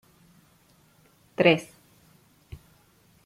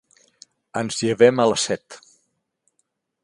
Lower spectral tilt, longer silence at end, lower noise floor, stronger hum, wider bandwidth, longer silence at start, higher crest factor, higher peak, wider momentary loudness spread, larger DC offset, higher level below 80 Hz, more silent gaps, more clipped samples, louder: first, -6 dB/octave vs -4 dB/octave; first, 1.6 s vs 1.3 s; second, -61 dBFS vs -73 dBFS; neither; first, 16 kHz vs 11.5 kHz; first, 1.4 s vs 0.75 s; about the same, 26 dB vs 22 dB; about the same, -4 dBFS vs -2 dBFS; first, 28 LU vs 14 LU; neither; about the same, -62 dBFS vs -64 dBFS; neither; neither; second, -23 LUFS vs -20 LUFS